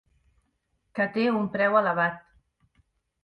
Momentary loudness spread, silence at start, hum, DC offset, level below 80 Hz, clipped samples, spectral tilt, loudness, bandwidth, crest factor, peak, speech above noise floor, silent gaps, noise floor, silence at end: 12 LU; 0.95 s; none; under 0.1%; -68 dBFS; under 0.1%; -8 dB/octave; -25 LUFS; 5.6 kHz; 20 dB; -8 dBFS; 50 dB; none; -74 dBFS; 1.05 s